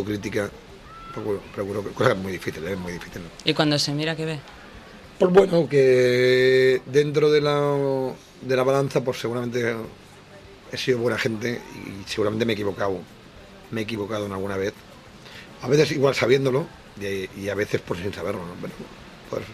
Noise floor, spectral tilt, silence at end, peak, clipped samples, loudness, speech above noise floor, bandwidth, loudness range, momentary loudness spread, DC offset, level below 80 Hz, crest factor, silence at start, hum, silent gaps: -46 dBFS; -5.5 dB/octave; 0 s; -2 dBFS; under 0.1%; -23 LUFS; 23 dB; 14.5 kHz; 9 LU; 19 LU; under 0.1%; -54 dBFS; 22 dB; 0 s; none; none